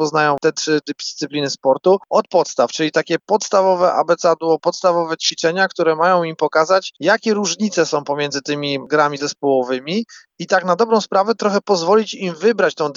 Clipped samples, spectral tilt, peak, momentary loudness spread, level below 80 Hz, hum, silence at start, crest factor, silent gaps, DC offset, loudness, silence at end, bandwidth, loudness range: under 0.1%; -4 dB/octave; -2 dBFS; 6 LU; -72 dBFS; none; 0 s; 16 dB; none; under 0.1%; -17 LUFS; 0.05 s; 7.8 kHz; 2 LU